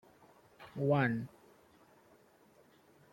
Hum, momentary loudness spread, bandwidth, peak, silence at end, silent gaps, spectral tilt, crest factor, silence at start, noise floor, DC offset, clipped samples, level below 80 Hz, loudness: none; 20 LU; 16.5 kHz; -16 dBFS; 1.85 s; none; -8.5 dB/octave; 22 dB; 0.6 s; -65 dBFS; under 0.1%; under 0.1%; -76 dBFS; -34 LUFS